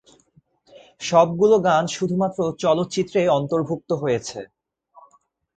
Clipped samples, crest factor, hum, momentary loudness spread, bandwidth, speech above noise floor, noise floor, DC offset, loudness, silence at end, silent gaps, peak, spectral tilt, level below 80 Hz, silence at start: under 0.1%; 20 dB; none; 9 LU; 9.2 kHz; 40 dB; -60 dBFS; under 0.1%; -21 LUFS; 1.1 s; none; -2 dBFS; -5.5 dB/octave; -60 dBFS; 1 s